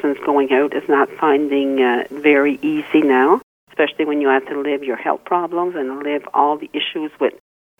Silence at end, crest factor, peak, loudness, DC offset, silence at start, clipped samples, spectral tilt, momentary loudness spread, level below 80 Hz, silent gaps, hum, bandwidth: 0.5 s; 16 dB; -2 dBFS; -18 LUFS; under 0.1%; 0.05 s; under 0.1%; -6 dB/octave; 8 LU; -66 dBFS; 3.43-3.67 s; none; 3.9 kHz